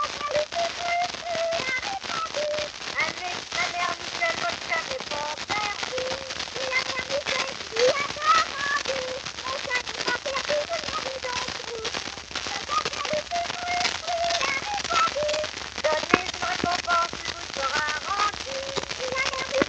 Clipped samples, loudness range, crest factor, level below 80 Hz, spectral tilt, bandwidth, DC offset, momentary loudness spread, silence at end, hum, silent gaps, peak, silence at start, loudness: under 0.1%; 3 LU; 28 dB; -54 dBFS; -1.5 dB/octave; 10 kHz; under 0.1%; 7 LU; 0 s; none; none; 0 dBFS; 0 s; -26 LUFS